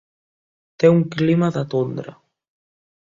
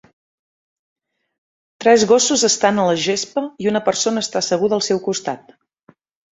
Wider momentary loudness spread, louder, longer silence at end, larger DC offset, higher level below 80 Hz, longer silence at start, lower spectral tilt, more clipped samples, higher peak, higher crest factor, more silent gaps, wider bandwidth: first, 14 LU vs 10 LU; about the same, -19 LUFS vs -17 LUFS; about the same, 1.05 s vs 0.95 s; neither; about the same, -60 dBFS vs -62 dBFS; second, 0.8 s vs 1.8 s; first, -8.5 dB/octave vs -3 dB/octave; neither; about the same, -2 dBFS vs -2 dBFS; about the same, 20 dB vs 18 dB; neither; second, 7.4 kHz vs 8.2 kHz